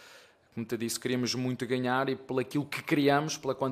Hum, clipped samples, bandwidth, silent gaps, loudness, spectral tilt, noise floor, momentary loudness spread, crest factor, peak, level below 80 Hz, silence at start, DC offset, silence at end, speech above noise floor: none; under 0.1%; 15.5 kHz; none; -30 LUFS; -4.5 dB/octave; -57 dBFS; 8 LU; 20 dB; -12 dBFS; -72 dBFS; 0 s; under 0.1%; 0 s; 26 dB